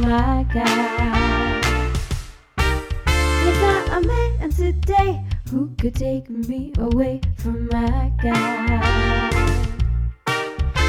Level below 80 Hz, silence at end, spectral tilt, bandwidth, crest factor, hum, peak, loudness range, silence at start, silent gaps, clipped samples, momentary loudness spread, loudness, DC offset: -24 dBFS; 0 s; -6 dB/octave; 15 kHz; 16 dB; none; -4 dBFS; 2 LU; 0 s; none; under 0.1%; 7 LU; -21 LUFS; under 0.1%